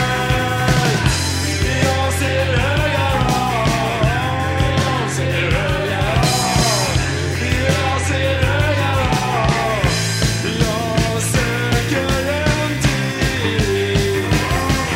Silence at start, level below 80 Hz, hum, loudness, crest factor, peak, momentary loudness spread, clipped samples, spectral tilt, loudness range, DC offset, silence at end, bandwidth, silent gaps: 0 s; -28 dBFS; none; -17 LUFS; 16 dB; -2 dBFS; 3 LU; under 0.1%; -4.5 dB/octave; 1 LU; under 0.1%; 0 s; 16.5 kHz; none